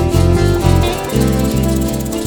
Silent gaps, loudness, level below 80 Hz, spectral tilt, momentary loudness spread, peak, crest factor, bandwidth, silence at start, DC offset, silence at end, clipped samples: none; -14 LUFS; -22 dBFS; -6 dB/octave; 4 LU; 0 dBFS; 12 dB; over 20 kHz; 0 s; under 0.1%; 0 s; under 0.1%